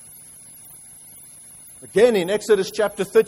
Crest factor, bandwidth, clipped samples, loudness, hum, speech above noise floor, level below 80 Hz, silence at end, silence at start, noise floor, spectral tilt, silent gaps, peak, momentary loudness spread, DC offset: 18 dB; 16 kHz; under 0.1%; -19 LUFS; none; 25 dB; -60 dBFS; 0 s; 1.85 s; -44 dBFS; -4 dB/octave; none; -4 dBFS; 23 LU; under 0.1%